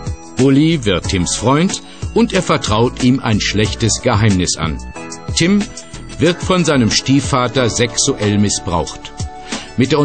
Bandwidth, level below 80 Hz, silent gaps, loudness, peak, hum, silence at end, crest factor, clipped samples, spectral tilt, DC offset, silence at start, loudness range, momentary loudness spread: 9.2 kHz; -32 dBFS; none; -15 LUFS; -2 dBFS; none; 0 s; 14 dB; under 0.1%; -4.5 dB/octave; 1%; 0 s; 1 LU; 13 LU